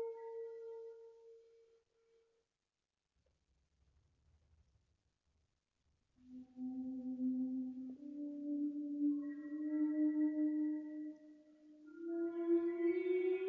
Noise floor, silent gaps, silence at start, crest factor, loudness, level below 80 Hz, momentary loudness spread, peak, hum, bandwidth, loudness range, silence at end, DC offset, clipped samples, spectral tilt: under -90 dBFS; none; 0 s; 16 dB; -40 LUFS; -84 dBFS; 18 LU; -26 dBFS; none; 3.8 kHz; 16 LU; 0 s; under 0.1%; under 0.1%; -6 dB/octave